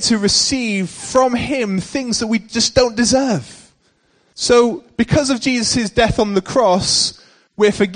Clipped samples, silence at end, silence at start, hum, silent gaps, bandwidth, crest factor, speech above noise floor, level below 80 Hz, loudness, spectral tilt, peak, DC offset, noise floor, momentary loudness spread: under 0.1%; 0 s; 0 s; none; none; 10 kHz; 16 dB; 43 dB; -40 dBFS; -16 LUFS; -3.5 dB/octave; 0 dBFS; under 0.1%; -59 dBFS; 7 LU